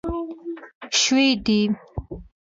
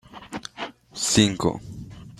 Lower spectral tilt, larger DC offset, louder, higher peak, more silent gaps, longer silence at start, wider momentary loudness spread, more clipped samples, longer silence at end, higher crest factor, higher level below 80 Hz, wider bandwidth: about the same, -3 dB/octave vs -3.5 dB/octave; neither; about the same, -20 LUFS vs -22 LUFS; second, -8 dBFS vs -2 dBFS; first, 0.75-0.81 s vs none; about the same, 0.05 s vs 0.15 s; about the same, 18 LU vs 19 LU; neither; first, 0.2 s vs 0.05 s; second, 16 dB vs 24 dB; first, -42 dBFS vs -50 dBFS; second, 7.8 kHz vs 15 kHz